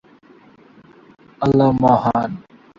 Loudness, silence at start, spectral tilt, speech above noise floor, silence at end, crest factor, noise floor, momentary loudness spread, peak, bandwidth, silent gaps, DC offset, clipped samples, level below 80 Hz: -17 LUFS; 1.4 s; -9 dB/octave; 33 dB; 0.4 s; 18 dB; -48 dBFS; 12 LU; -2 dBFS; 7.2 kHz; none; under 0.1%; under 0.1%; -48 dBFS